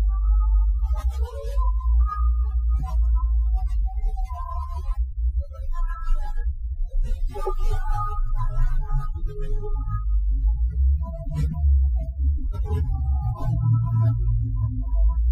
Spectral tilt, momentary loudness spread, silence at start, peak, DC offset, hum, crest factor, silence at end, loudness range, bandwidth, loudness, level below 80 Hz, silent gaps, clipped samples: -9 dB/octave; 9 LU; 0 s; -10 dBFS; under 0.1%; none; 10 dB; 0 s; 6 LU; 3 kHz; -26 LUFS; -22 dBFS; none; under 0.1%